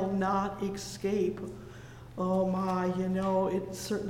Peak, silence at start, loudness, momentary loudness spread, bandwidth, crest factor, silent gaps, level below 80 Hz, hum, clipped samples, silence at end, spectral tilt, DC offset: -18 dBFS; 0 s; -31 LUFS; 15 LU; 16 kHz; 14 dB; none; -56 dBFS; none; under 0.1%; 0 s; -6.5 dB/octave; under 0.1%